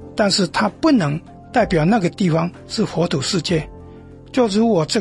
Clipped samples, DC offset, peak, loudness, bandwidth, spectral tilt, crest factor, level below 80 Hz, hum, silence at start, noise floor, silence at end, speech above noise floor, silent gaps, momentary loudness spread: under 0.1%; under 0.1%; -4 dBFS; -18 LUFS; 11.5 kHz; -5.5 dB/octave; 14 dB; -44 dBFS; none; 0 s; -39 dBFS; 0 s; 22 dB; none; 7 LU